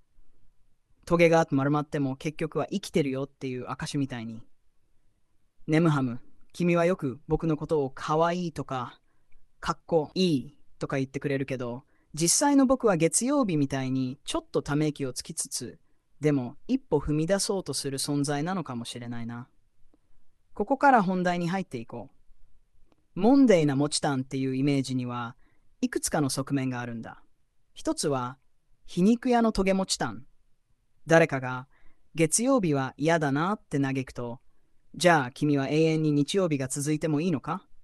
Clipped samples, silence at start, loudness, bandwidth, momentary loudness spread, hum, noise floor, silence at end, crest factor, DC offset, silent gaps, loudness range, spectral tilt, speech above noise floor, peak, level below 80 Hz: under 0.1%; 0.2 s; -27 LUFS; 12.5 kHz; 15 LU; none; -64 dBFS; 0 s; 20 dB; under 0.1%; none; 6 LU; -5 dB/octave; 37 dB; -6 dBFS; -54 dBFS